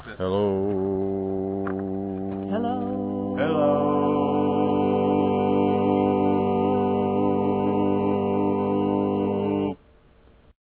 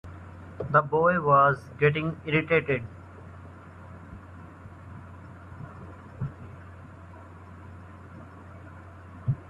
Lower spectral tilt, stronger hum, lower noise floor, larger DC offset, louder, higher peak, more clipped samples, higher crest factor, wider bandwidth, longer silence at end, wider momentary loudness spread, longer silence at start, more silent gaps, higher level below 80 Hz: first, -12 dB/octave vs -8.5 dB/octave; neither; first, -55 dBFS vs -46 dBFS; neither; about the same, -24 LUFS vs -25 LUFS; about the same, -10 dBFS vs -8 dBFS; neither; second, 14 dB vs 22 dB; second, 4 kHz vs 7.2 kHz; first, 0.9 s vs 0.05 s; second, 7 LU vs 24 LU; about the same, 0 s vs 0.05 s; neither; first, -50 dBFS vs -58 dBFS